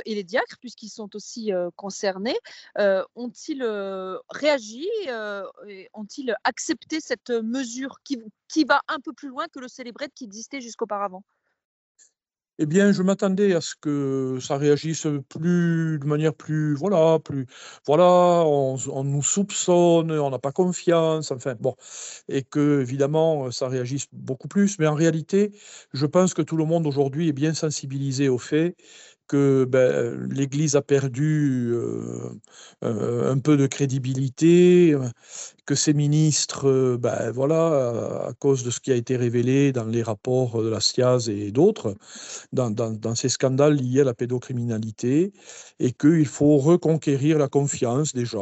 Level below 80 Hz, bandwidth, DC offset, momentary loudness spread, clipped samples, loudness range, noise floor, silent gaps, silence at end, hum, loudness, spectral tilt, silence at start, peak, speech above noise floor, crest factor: -68 dBFS; 8.4 kHz; under 0.1%; 14 LU; under 0.1%; 8 LU; -76 dBFS; 11.65-11.95 s; 0 s; none; -23 LUFS; -5.5 dB/octave; 0.05 s; -6 dBFS; 54 dB; 18 dB